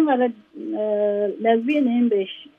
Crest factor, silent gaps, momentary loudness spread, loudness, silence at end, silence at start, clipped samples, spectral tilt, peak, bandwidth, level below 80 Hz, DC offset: 14 dB; none; 7 LU; -21 LUFS; 0.15 s; 0 s; under 0.1%; -8 dB/octave; -6 dBFS; 3.8 kHz; -78 dBFS; under 0.1%